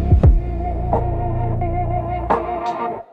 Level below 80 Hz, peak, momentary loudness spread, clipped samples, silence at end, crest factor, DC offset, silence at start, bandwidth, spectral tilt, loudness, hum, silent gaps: -22 dBFS; -4 dBFS; 9 LU; under 0.1%; 0.1 s; 14 dB; under 0.1%; 0 s; 5 kHz; -10 dB/octave; -20 LUFS; none; none